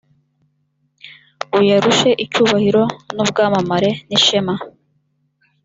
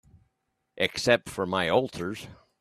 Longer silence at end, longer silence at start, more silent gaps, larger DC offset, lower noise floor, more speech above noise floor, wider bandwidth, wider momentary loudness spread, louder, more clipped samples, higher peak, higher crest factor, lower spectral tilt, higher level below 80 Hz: first, 0.95 s vs 0.25 s; first, 1.05 s vs 0.75 s; neither; neither; second, -65 dBFS vs -78 dBFS; about the same, 50 dB vs 51 dB; second, 7.8 kHz vs 14.5 kHz; second, 9 LU vs 13 LU; first, -15 LUFS vs -27 LUFS; neither; first, -2 dBFS vs -6 dBFS; second, 16 dB vs 24 dB; about the same, -4 dB/octave vs -4 dB/octave; about the same, -56 dBFS vs -60 dBFS